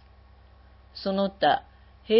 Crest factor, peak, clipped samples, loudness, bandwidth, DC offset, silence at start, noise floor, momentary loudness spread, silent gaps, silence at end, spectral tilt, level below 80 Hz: 18 dB; -8 dBFS; under 0.1%; -26 LUFS; 5.8 kHz; under 0.1%; 0.95 s; -53 dBFS; 12 LU; none; 0 s; -9.5 dB/octave; -54 dBFS